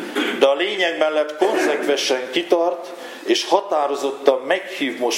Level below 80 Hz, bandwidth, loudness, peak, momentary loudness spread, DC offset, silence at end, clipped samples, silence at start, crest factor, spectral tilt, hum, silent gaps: -80 dBFS; 16.5 kHz; -19 LUFS; 0 dBFS; 5 LU; under 0.1%; 0 s; under 0.1%; 0 s; 20 dB; -2 dB/octave; none; none